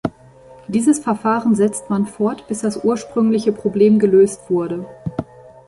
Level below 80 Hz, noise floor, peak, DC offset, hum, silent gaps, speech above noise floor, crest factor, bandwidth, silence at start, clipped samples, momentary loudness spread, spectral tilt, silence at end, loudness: -52 dBFS; -44 dBFS; -2 dBFS; under 0.1%; none; none; 27 dB; 14 dB; 11.5 kHz; 0.05 s; under 0.1%; 14 LU; -6.5 dB/octave; 0.45 s; -18 LUFS